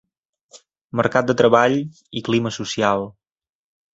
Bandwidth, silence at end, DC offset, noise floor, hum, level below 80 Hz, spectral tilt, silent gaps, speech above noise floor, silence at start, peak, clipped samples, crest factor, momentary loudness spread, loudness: 8 kHz; 0.85 s; under 0.1%; -60 dBFS; none; -58 dBFS; -5.5 dB/octave; none; 41 dB; 0.95 s; 0 dBFS; under 0.1%; 20 dB; 14 LU; -19 LUFS